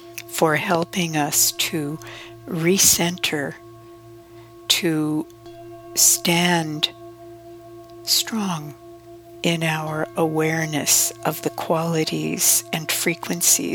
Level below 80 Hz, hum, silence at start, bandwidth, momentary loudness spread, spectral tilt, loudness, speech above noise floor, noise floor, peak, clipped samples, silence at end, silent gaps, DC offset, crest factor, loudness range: -58 dBFS; none; 0 s; 20 kHz; 16 LU; -2.5 dB/octave; -20 LUFS; 22 dB; -43 dBFS; -2 dBFS; under 0.1%; 0 s; none; under 0.1%; 20 dB; 5 LU